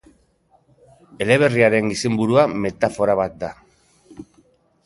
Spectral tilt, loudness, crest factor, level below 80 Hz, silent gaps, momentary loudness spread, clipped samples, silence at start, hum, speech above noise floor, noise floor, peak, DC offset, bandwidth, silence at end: -5.5 dB/octave; -18 LUFS; 20 dB; -54 dBFS; none; 11 LU; under 0.1%; 1.2 s; none; 41 dB; -59 dBFS; -2 dBFS; under 0.1%; 11.5 kHz; 0.65 s